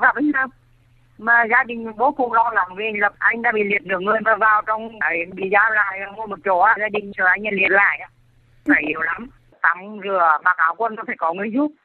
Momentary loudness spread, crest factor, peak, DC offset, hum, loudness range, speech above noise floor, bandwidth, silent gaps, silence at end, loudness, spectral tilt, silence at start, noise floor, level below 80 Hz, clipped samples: 9 LU; 18 dB; 0 dBFS; under 0.1%; none; 2 LU; 35 dB; 4.4 kHz; none; 0.15 s; -18 LUFS; -7.5 dB/octave; 0 s; -54 dBFS; -58 dBFS; under 0.1%